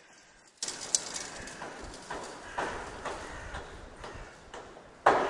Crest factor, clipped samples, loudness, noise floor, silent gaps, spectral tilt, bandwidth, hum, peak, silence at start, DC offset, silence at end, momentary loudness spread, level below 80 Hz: 32 dB; under 0.1%; -36 LUFS; -58 dBFS; none; -1.5 dB/octave; 11.5 kHz; none; -4 dBFS; 0 s; under 0.1%; 0 s; 17 LU; -54 dBFS